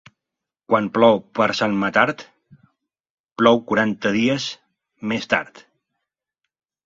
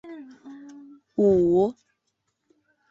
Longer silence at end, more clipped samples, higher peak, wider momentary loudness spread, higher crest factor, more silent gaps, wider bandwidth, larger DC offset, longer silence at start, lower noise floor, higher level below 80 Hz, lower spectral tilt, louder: first, 1.45 s vs 1.2 s; neither; first, 0 dBFS vs -10 dBFS; second, 16 LU vs 25 LU; first, 22 dB vs 16 dB; first, 3.00-3.04 s, 3.10-3.29 s vs none; about the same, 7.8 kHz vs 7.4 kHz; neither; first, 0.7 s vs 0.05 s; first, -85 dBFS vs -77 dBFS; about the same, -60 dBFS vs -58 dBFS; second, -5 dB/octave vs -9.5 dB/octave; first, -19 LUFS vs -22 LUFS